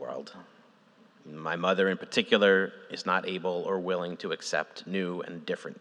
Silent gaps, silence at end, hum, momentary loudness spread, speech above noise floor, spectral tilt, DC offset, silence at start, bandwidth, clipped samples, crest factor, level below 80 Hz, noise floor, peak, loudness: none; 0 s; none; 14 LU; 30 dB; -4.5 dB/octave; under 0.1%; 0 s; 10.5 kHz; under 0.1%; 22 dB; -88 dBFS; -60 dBFS; -8 dBFS; -29 LUFS